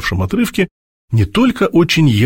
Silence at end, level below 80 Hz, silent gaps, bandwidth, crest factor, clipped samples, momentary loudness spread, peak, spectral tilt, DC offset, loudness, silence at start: 0 s; -36 dBFS; 0.71-1.08 s; 16.5 kHz; 14 dB; under 0.1%; 8 LU; 0 dBFS; -6 dB/octave; under 0.1%; -15 LUFS; 0 s